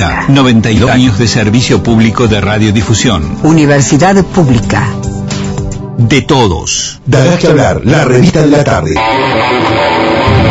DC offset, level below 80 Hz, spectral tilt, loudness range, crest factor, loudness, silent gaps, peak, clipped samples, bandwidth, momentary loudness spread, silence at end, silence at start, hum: under 0.1%; -26 dBFS; -5.5 dB/octave; 2 LU; 8 dB; -8 LUFS; none; 0 dBFS; 2%; 8.8 kHz; 6 LU; 0 s; 0 s; none